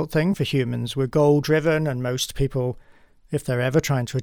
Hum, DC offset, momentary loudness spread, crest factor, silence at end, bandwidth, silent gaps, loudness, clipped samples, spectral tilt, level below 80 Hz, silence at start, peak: none; under 0.1%; 9 LU; 16 dB; 0 s; 19 kHz; none; -22 LUFS; under 0.1%; -6 dB/octave; -44 dBFS; 0 s; -6 dBFS